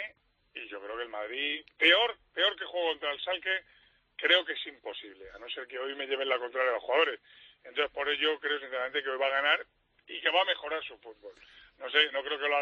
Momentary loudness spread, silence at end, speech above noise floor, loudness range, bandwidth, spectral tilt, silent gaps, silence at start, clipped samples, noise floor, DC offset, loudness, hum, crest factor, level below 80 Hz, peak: 18 LU; 0 s; 26 dB; 3 LU; 7.6 kHz; 4 dB/octave; none; 0 s; under 0.1%; -58 dBFS; under 0.1%; -29 LUFS; none; 22 dB; -72 dBFS; -10 dBFS